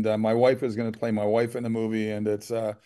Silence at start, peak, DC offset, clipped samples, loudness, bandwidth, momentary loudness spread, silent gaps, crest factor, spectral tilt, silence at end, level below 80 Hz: 0 s; -10 dBFS; under 0.1%; under 0.1%; -26 LUFS; 12.5 kHz; 7 LU; none; 16 dB; -7 dB/octave; 0.1 s; -70 dBFS